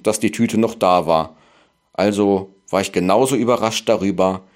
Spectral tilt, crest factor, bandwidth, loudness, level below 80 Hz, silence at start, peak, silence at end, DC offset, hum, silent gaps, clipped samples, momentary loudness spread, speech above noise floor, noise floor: -5 dB/octave; 16 dB; 16 kHz; -18 LUFS; -56 dBFS; 0.05 s; -2 dBFS; 0.15 s; under 0.1%; none; none; under 0.1%; 6 LU; 39 dB; -56 dBFS